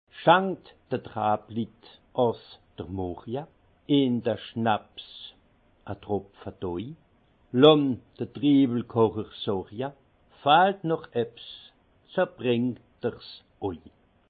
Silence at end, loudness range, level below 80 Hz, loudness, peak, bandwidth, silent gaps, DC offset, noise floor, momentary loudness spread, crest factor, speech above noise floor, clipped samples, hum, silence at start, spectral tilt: 0.5 s; 7 LU; -64 dBFS; -26 LUFS; -4 dBFS; 4.8 kHz; none; under 0.1%; -62 dBFS; 21 LU; 24 dB; 36 dB; under 0.1%; none; 0.15 s; -9.5 dB/octave